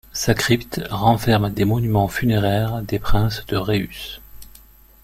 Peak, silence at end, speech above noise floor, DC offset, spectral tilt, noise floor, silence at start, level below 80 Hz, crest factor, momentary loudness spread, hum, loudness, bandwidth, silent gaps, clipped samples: -2 dBFS; 0.6 s; 29 dB; under 0.1%; -5.5 dB/octave; -47 dBFS; 0.15 s; -34 dBFS; 18 dB; 9 LU; none; -20 LUFS; 16.5 kHz; none; under 0.1%